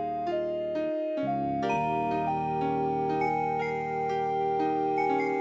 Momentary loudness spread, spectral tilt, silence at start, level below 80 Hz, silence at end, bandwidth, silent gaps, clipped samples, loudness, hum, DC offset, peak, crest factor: 3 LU; -7.5 dB/octave; 0 s; -58 dBFS; 0 s; 7.8 kHz; none; under 0.1%; -29 LUFS; none; under 0.1%; -16 dBFS; 12 dB